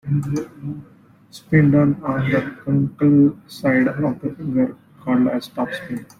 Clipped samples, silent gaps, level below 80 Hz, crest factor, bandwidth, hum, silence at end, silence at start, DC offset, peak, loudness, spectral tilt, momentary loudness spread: under 0.1%; none; -52 dBFS; 16 dB; 13.5 kHz; none; 0.15 s; 0.05 s; under 0.1%; -4 dBFS; -19 LUFS; -8.5 dB/octave; 13 LU